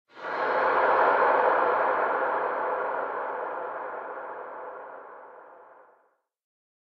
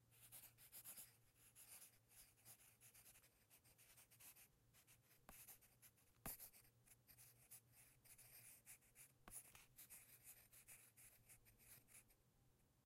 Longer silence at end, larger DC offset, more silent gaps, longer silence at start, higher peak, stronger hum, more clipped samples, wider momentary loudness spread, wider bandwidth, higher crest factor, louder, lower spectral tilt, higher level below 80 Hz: first, 1.2 s vs 0 s; neither; neither; first, 0.15 s vs 0 s; first, -10 dBFS vs -34 dBFS; neither; neither; first, 19 LU vs 10 LU; second, 6 kHz vs 16 kHz; second, 18 dB vs 34 dB; first, -26 LUFS vs -64 LUFS; first, -5.5 dB/octave vs -1.5 dB/octave; first, -72 dBFS vs -82 dBFS